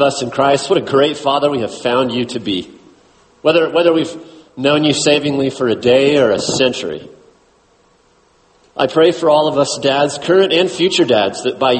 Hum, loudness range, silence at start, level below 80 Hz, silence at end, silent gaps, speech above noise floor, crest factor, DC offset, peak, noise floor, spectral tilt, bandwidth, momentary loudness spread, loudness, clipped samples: none; 4 LU; 0 s; -54 dBFS; 0 s; none; 40 dB; 14 dB; under 0.1%; 0 dBFS; -53 dBFS; -4 dB/octave; 8.8 kHz; 8 LU; -14 LUFS; under 0.1%